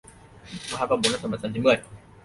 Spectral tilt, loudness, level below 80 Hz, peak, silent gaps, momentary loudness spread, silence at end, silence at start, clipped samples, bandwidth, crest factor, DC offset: -4 dB/octave; -25 LUFS; -56 dBFS; -6 dBFS; none; 14 LU; 0.25 s; 0.45 s; under 0.1%; 11.5 kHz; 20 dB; under 0.1%